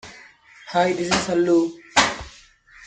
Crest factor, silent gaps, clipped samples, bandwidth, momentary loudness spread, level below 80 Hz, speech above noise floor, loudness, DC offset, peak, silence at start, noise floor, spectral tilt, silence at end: 20 dB; none; under 0.1%; 9.4 kHz; 9 LU; -50 dBFS; 30 dB; -20 LUFS; under 0.1%; -2 dBFS; 0.05 s; -50 dBFS; -3.5 dB/octave; 0.55 s